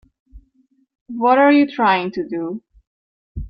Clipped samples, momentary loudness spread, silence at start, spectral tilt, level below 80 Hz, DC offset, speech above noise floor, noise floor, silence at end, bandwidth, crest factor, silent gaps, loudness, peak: under 0.1%; 21 LU; 0.35 s; -8 dB/octave; -44 dBFS; under 0.1%; 45 dB; -61 dBFS; 0 s; 5.8 kHz; 16 dB; 1.01-1.06 s, 2.87-3.35 s; -17 LUFS; -2 dBFS